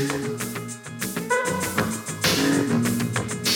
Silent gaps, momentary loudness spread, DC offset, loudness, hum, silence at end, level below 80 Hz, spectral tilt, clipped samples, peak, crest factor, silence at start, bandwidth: none; 10 LU; under 0.1%; -24 LUFS; none; 0 s; -54 dBFS; -4 dB/octave; under 0.1%; -8 dBFS; 18 dB; 0 s; 19 kHz